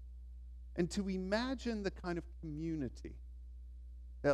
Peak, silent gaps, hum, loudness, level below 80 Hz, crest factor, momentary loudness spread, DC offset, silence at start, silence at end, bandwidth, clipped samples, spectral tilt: -20 dBFS; none; 60 Hz at -50 dBFS; -40 LUFS; -50 dBFS; 20 dB; 17 LU; under 0.1%; 0 s; 0 s; 11.5 kHz; under 0.1%; -6 dB/octave